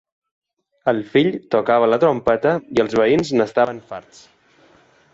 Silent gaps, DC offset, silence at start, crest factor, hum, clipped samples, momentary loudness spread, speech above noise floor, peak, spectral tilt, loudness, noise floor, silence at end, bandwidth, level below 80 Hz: none; under 0.1%; 0.85 s; 16 dB; none; under 0.1%; 7 LU; 36 dB; -4 dBFS; -6.5 dB/octave; -18 LUFS; -53 dBFS; 1.15 s; 7.8 kHz; -56 dBFS